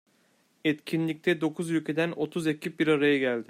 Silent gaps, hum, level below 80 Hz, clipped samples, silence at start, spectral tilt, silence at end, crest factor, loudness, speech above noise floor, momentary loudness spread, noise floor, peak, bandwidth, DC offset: none; none; -74 dBFS; under 0.1%; 0.65 s; -6 dB/octave; 0.05 s; 16 dB; -28 LUFS; 40 dB; 6 LU; -67 dBFS; -12 dBFS; 15 kHz; under 0.1%